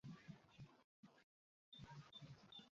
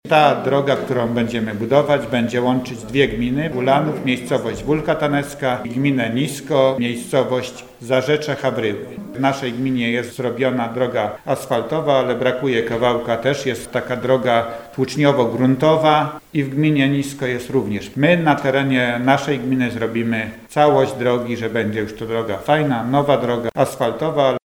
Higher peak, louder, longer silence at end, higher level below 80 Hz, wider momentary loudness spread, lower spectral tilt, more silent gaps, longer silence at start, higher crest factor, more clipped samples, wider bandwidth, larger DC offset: second, -46 dBFS vs 0 dBFS; second, -62 LUFS vs -19 LUFS; about the same, 0.1 s vs 0.1 s; second, -84 dBFS vs -50 dBFS; about the same, 6 LU vs 7 LU; second, -4.5 dB/octave vs -6 dB/octave; first, 0.84-1.03 s, 1.24-1.72 s vs none; about the same, 0.05 s vs 0.05 s; about the same, 16 dB vs 18 dB; neither; second, 7.4 kHz vs 17.5 kHz; neither